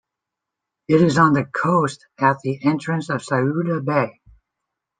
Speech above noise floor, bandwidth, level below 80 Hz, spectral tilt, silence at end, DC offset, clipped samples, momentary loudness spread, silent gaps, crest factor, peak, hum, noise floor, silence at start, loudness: 64 dB; 9.6 kHz; -60 dBFS; -7 dB/octave; 0.9 s; under 0.1%; under 0.1%; 8 LU; none; 18 dB; -2 dBFS; none; -83 dBFS; 0.9 s; -20 LUFS